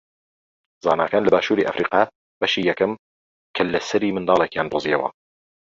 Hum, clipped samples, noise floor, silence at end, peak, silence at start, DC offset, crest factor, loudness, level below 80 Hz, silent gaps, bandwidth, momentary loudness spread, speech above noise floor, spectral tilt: none; under 0.1%; under -90 dBFS; 0.55 s; -2 dBFS; 0.85 s; under 0.1%; 20 dB; -21 LUFS; -58 dBFS; 2.15-2.41 s, 2.99-3.54 s; 7.6 kHz; 7 LU; over 70 dB; -5 dB/octave